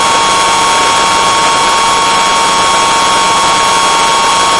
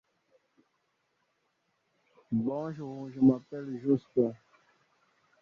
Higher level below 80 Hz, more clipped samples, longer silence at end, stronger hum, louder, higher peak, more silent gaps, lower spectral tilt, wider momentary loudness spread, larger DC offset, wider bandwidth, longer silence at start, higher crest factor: first, -38 dBFS vs -72 dBFS; neither; second, 0 s vs 1.05 s; neither; first, -8 LUFS vs -31 LUFS; first, 0 dBFS vs -12 dBFS; neither; second, -0.5 dB/octave vs -10.5 dB/octave; second, 0 LU vs 14 LU; neither; first, 11.5 kHz vs 6 kHz; second, 0 s vs 2.3 s; second, 8 dB vs 22 dB